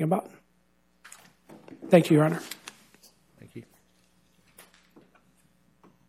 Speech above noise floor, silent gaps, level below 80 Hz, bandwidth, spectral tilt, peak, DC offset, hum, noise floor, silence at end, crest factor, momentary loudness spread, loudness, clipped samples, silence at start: 46 dB; none; -74 dBFS; 15.5 kHz; -7 dB/octave; -4 dBFS; under 0.1%; none; -68 dBFS; 2.45 s; 26 dB; 30 LU; -23 LUFS; under 0.1%; 0 s